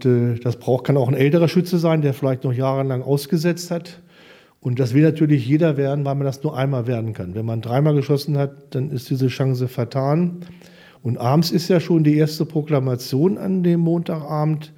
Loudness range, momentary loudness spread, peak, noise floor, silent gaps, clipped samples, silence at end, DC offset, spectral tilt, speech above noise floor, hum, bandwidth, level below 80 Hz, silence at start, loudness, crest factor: 3 LU; 9 LU; -4 dBFS; -49 dBFS; none; under 0.1%; 0.05 s; under 0.1%; -7.5 dB/octave; 30 dB; none; 16.5 kHz; -62 dBFS; 0 s; -20 LUFS; 16 dB